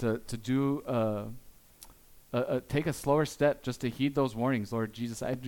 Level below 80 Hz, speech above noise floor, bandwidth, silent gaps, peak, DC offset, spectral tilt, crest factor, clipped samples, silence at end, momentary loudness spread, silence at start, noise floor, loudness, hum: -56 dBFS; 24 dB; 18 kHz; none; -14 dBFS; under 0.1%; -6.5 dB/octave; 18 dB; under 0.1%; 0 s; 7 LU; 0 s; -55 dBFS; -31 LUFS; none